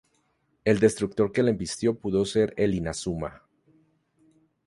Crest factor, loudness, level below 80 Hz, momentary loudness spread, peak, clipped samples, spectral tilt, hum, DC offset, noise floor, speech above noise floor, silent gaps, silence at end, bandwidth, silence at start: 20 dB; -26 LUFS; -52 dBFS; 9 LU; -6 dBFS; under 0.1%; -5.5 dB/octave; none; under 0.1%; -70 dBFS; 46 dB; none; 1.3 s; 11.5 kHz; 0.65 s